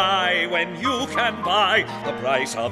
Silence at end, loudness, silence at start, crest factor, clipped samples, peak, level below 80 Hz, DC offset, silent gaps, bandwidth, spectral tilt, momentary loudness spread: 0 s; -21 LUFS; 0 s; 16 dB; under 0.1%; -6 dBFS; -58 dBFS; under 0.1%; none; 15.5 kHz; -3 dB/octave; 6 LU